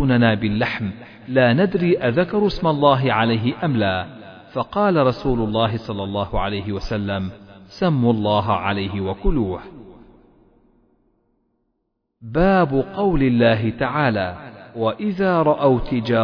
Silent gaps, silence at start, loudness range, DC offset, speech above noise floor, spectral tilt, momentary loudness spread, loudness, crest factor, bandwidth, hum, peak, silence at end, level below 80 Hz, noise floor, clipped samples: none; 0 s; 7 LU; under 0.1%; 55 dB; -8.5 dB/octave; 11 LU; -20 LUFS; 18 dB; 5.4 kHz; none; -2 dBFS; 0 s; -36 dBFS; -73 dBFS; under 0.1%